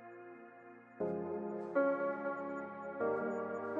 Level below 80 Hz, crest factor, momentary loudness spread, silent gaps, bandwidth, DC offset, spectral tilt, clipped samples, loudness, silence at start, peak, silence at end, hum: under -90 dBFS; 18 dB; 20 LU; none; 7.4 kHz; under 0.1%; -9 dB/octave; under 0.1%; -38 LUFS; 0 s; -20 dBFS; 0 s; none